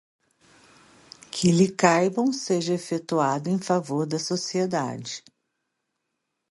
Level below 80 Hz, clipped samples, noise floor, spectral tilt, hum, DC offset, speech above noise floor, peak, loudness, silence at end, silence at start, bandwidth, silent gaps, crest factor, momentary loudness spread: -66 dBFS; under 0.1%; -80 dBFS; -5 dB/octave; none; under 0.1%; 56 dB; -4 dBFS; -24 LUFS; 1.3 s; 1.35 s; 11.5 kHz; none; 22 dB; 11 LU